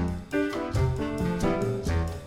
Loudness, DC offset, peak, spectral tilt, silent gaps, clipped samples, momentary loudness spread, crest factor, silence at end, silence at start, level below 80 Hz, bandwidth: -28 LUFS; under 0.1%; -14 dBFS; -7 dB/octave; none; under 0.1%; 2 LU; 14 dB; 0 s; 0 s; -36 dBFS; 15.5 kHz